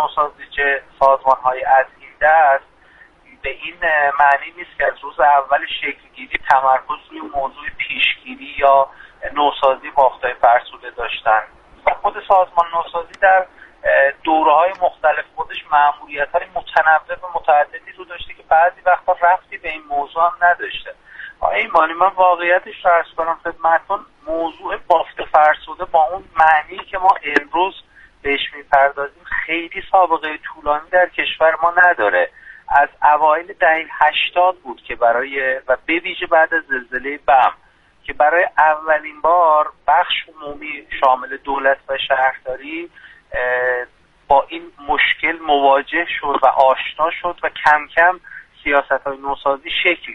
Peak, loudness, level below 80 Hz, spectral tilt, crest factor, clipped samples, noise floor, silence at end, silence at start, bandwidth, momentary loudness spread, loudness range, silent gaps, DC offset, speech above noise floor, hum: 0 dBFS; -16 LUFS; -48 dBFS; -4.5 dB/octave; 16 dB; under 0.1%; -48 dBFS; 0 s; 0 s; 6.4 kHz; 13 LU; 3 LU; none; under 0.1%; 31 dB; none